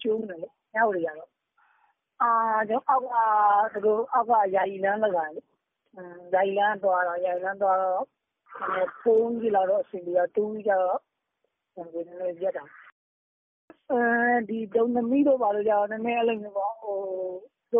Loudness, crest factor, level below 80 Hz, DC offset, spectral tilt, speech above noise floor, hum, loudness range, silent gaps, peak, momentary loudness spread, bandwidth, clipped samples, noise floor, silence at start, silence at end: -25 LUFS; 16 dB; -74 dBFS; under 0.1%; 1 dB/octave; 54 dB; none; 6 LU; 12.92-13.68 s; -10 dBFS; 13 LU; 3.7 kHz; under 0.1%; -79 dBFS; 0 s; 0 s